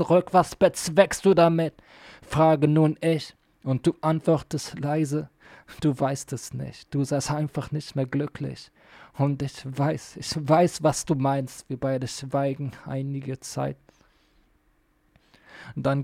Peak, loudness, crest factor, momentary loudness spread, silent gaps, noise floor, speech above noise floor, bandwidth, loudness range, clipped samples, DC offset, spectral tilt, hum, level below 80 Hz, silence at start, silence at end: -6 dBFS; -25 LUFS; 20 dB; 14 LU; none; -65 dBFS; 41 dB; 15.5 kHz; 9 LU; under 0.1%; under 0.1%; -6 dB/octave; none; -56 dBFS; 0 s; 0 s